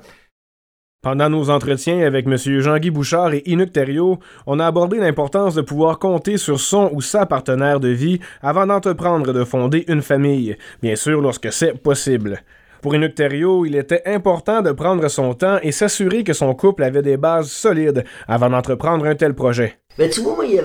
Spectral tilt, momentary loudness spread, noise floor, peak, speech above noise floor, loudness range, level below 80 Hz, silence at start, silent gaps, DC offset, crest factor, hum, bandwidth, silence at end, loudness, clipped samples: -5.5 dB/octave; 4 LU; under -90 dBFS; -2 dBFS; over 73 dB; 1 LU; -50 dBFS; 1.05 s; none; under 0.1%; 14 dB; none; over 20 kHz; 0 s; -17 LUFS; under 0.1%